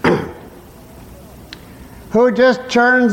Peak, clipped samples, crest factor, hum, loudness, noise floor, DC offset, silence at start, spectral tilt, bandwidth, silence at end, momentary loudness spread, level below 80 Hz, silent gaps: -2 dBFS; under 0.1%; 14 dB; none; -14 LUFS; -39 dBFS; under 0.1%; 0.05 s; -5.5 dB/octave; 16.5 kHz; 0 s; 24 LU; -44 dBFS; none